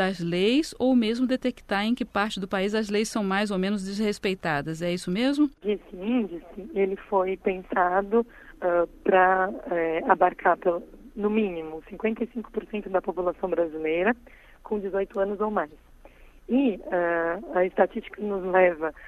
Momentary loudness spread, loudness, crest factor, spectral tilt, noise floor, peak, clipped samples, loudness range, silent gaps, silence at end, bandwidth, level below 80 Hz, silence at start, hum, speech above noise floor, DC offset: 9 LU; -26 LUFS; 22 dB; -5.5 dB/octave; -51 dBFS; -4 dBFS; under 0.1%; 5 LU; none; 0 s; 13 kHz; -54 dBFS; 0 s; none; 25 dB; under 0.1%